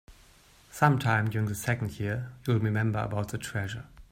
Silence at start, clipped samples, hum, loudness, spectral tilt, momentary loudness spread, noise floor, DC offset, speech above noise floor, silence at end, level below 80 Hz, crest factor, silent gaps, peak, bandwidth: 0.1 s; under 0.1%; none; -29 LUFS; -6 dB/octave; 9 LU; -58 dBFS; under 0.1%; 29 dB; 0.1 s; -56 dBFS; 22 dB; none; -8 dBFS; 16 kHz